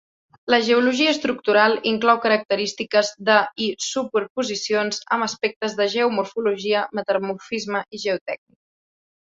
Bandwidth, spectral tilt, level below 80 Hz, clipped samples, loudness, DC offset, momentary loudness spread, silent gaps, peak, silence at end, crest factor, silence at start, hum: 8 kHz; -3 dB/octave; -68 dBFS; under 0.1%; -21 LUFS; under 0.1%; 8 LU; 2.45-2.49 s, 4.30-4.35 s, 5.56-5.60 s, 8.21-8.26 s; -2 dBFS; 1 s; 20 dB; 0.45 s; none